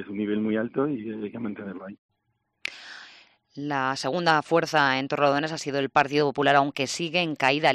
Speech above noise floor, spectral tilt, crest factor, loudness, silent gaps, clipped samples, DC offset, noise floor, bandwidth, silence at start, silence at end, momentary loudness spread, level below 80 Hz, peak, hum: 51 dB; -4.5 dB/octave; 20 dB; -25 LUFS; 1.98-2.09 s; under 0.1%; under 0.1%; -76 dBFS; 13 kHz; 0 s; 0 s; 15 LU; -68 dBFS; -6 dBFS; none